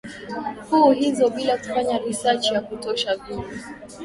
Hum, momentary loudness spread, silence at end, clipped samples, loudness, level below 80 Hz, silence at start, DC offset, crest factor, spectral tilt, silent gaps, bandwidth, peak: none; 15 LU; 0 s; under 0.1%; -22 LUFS; -54 dBFS; 0.05 s; under 0.1%; 18 dB; -4 dB/octave; none; 11.5 kHz; -4 dBFS